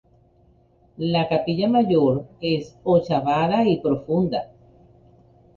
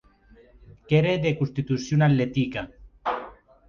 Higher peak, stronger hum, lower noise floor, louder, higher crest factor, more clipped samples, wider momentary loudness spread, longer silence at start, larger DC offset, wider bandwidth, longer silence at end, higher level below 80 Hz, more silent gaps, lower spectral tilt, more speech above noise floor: about the same, -6 dBFS vs -8 dBFS; neither; about the same, -57 dBFS vs -55 dBFS; first, -21 LUFS vs -25 LUFS; about the same, 16 dB vs 18 dB; neither; second, 7 LU vs 13 LU; first, 1 s vs 0.7 s; neither; about the same, 7.2 kHz vs 7.2 kHz; first, 1.1 s vs 0.35 s; about the same, -54 dBFS vs -52 dBFS; neither; first, -8.5 dB/octave vs -7 dB/octave; first, 37 dB vs 32 dB